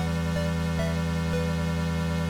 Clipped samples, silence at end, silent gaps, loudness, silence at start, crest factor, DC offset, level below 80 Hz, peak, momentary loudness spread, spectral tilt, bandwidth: under 0.1%; 0 s; none; -28 LUFS; 0 s; 10 dB; under 0.1%; -42 dBFS; -18 dBFS; 0 LU; -6.5 dB/octave; 15.5 kHz